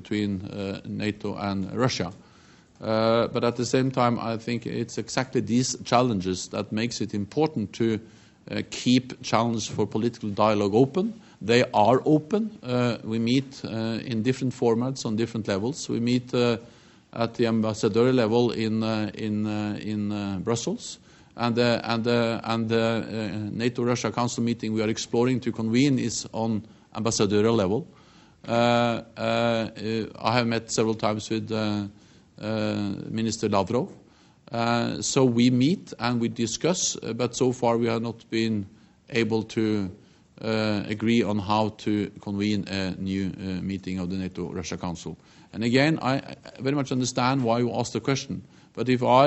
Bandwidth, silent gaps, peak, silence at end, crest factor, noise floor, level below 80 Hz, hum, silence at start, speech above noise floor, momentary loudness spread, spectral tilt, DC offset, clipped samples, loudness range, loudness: 8.2 kHz; none; -4 dBFS; 0 s; 22 dB; -54 dBFS; -62 dBFS; none; 0 s; 29 dB; 10 LU; -5.5 dB/octave; under 0.1%; under 0.1%; 4 LU; -26 LUFS